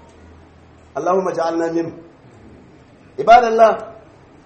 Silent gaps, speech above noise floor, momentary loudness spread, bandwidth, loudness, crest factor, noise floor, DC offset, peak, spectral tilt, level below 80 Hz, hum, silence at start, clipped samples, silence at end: none; 31 dB; 20 LU; 8.4 kHz; -15 LUFS; 18 dB; -46 dBFS; under 0.1%; 0 dBFS; -5.5 dB/octave; -52 dBFS; none; 0.95 s; under 0.1%; 0.55 s